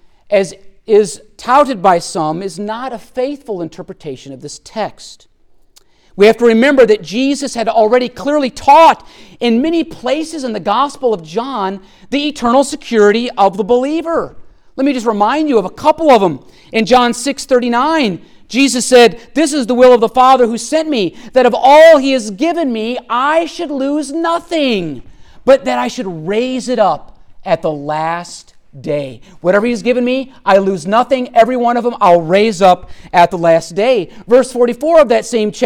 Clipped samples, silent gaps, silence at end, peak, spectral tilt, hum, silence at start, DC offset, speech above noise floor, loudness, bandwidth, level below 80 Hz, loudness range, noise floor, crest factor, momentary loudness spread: under 0.1%; none; 0 s; 0 dBFS; -4.5 dB/octave; none; 0.3 s; under 0.1%; 36 dB; -12 LUFS; 16 kHz; -46 dBFS; 7 LU; -48 dBFS; 12 dB; 14 LU